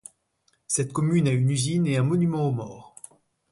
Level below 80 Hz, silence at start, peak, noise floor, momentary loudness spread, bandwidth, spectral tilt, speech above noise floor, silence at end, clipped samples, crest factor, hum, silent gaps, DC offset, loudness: -62 dBFS; 0.7 s; -10 dBFS; -69 dBFS; 19 LU; 11.5 kHz; -6 dB/octave; 46 dB; 0.7 s; under 0.1%; 14 dB; none; none; under 0.1%; -24 LUFS